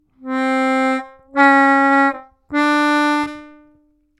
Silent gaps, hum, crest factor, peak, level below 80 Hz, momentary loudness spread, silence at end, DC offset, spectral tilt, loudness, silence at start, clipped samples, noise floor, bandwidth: none; none; 16 dB; 0 dBFS; -60 dBFS; 13 LU; 0.75 s; under 0.1%; -3 dB/octave; -16 LUFS; 0.25 s; under 0.1%; -57 dBFS; 12 kHz